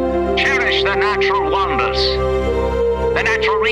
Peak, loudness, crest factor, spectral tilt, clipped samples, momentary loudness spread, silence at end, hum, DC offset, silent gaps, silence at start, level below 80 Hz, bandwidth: -4 dBFS; -16 LUFS; 12 dB; -5 dB/octave; under 0.1%; 3 LU; 0 s; none; under 0.1%; none; 0 s; -28 dBFS; 11 kHz